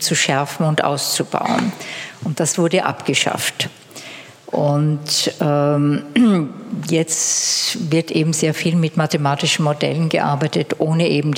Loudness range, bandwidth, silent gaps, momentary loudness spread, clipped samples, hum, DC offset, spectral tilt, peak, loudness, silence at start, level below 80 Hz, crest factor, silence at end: 3 LU; 17 kHz; none; 10 LU; under 0.1%; none; under 0.1%; -4 dB/octave; 0 dBFS; -18 LUFS; 0 s; -68 dBFS; 18 dB; 0 s